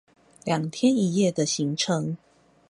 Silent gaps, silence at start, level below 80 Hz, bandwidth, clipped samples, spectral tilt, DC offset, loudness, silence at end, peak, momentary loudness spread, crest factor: none; 0.45 s; -68 dBFS; 11.5 kHz; under 0.1%; -5 dB/octave; under 0.1%; -25 LUFS; 0.55 s; -10 dBFS; 11 LU; 16 dB